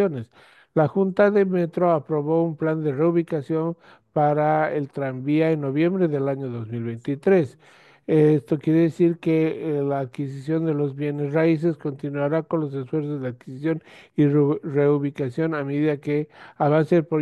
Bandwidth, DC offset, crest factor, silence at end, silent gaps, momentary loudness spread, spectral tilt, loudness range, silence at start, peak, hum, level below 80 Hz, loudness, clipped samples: 8.8 kHz; under 0.1%; 16 dB; 0 s; none; 10 LU; -9.5 dB/octave; 3 LU; 0 s; -6 dBFS; none; -68 dBFS; -23 LUFS; under 0.1%